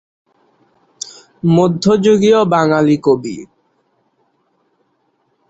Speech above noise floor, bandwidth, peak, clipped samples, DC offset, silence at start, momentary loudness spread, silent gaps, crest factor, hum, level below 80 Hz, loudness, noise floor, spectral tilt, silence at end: 51 dB; 8.2 kHz; -2 dBFS; under 0.1%; under 0.1%; 1.05 s; 19 LU; none; 14 dB; none; -54 dBFS; -13 LUFS; -63 dBFS; -6.5 dB/octave; 2.05 s